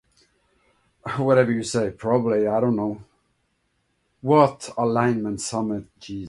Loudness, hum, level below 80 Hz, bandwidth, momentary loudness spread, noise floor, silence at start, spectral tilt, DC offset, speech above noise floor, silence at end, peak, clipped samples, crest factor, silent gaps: -22 LUFS; none; -58 dBFS; 11.5 kHz; 14 LU; -71 dBFS; 1.05 s; -6 dB/octave; under 0.1%; 49 dB; 0 s; -2 dBFS; under 0.1%; 22 dB; none